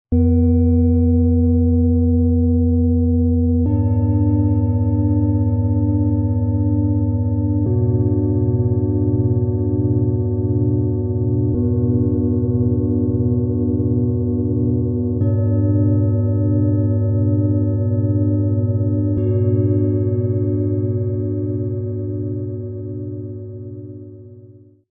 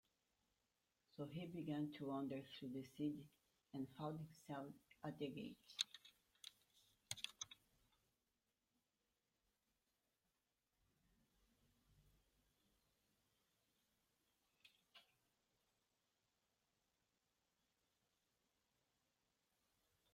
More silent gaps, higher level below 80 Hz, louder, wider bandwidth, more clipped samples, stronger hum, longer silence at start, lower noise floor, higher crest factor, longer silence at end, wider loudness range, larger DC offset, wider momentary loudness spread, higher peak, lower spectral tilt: neither; first, -36 dBFS vs -88 dBFS; first, -18 LUFS vs -51 LUFS; second, 1.8 kHz vs 16 kHz; neither; neither; second, 0.1 s vs 1.15 s; second, -44 dBFS vs under -90 dBFS; second, 10 dB vs 32 dB; second, 0.4 s vs 5.1 s; second, 5 LU vs 8 LU; neither; second, 8 LU vs 15 LU; first, -6 dBFS vs -24 dBFS; first, -17 dB/octave vs -4.5 dB/octave